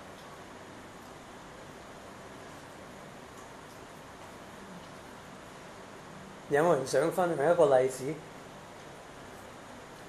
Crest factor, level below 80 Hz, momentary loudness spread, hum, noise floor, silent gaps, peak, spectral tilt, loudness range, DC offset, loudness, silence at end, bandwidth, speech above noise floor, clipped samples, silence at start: 22 dB; -66 dBFS; 21 LU; none; -48 dBFS; none; -12 dBFS; -5 dB/octave; 18 LU; under 0.1%; -28 LUFS; 0 s; 14 kHz; 21 dB; under 0.1%; 0 s